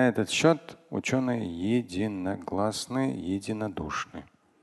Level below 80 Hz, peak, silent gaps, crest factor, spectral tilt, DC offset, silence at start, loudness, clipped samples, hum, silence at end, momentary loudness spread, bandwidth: -56 dBFS; -8 dBFS; none; 20 dB; -5 dB/octave; under 0.1%; 0 s; -29 LUFS; under 0.1%; none; 0.4 s; 10 LU; 12.5 kHz